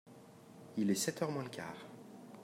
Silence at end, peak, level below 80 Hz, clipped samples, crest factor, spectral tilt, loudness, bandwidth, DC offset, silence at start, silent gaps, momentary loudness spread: 0 s; -20 dBFS; -84 dBFS; under 0.1%; 20 dB; -4.5 dB/octave; -38 LUFS; 16 kHz; under 0.1%; 0.05 s; none; 23 LU